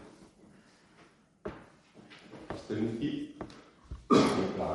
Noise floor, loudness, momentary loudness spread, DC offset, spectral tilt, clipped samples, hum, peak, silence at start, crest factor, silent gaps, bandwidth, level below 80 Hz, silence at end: -62 dBFS; -31 LUFS; 27 LU; under 0.1%; -6 dB/octave; under 0.1%; none; -10 dBFS; 0 s; 24 dB; none; 11.5 kHz; -58 dBFS; 0 s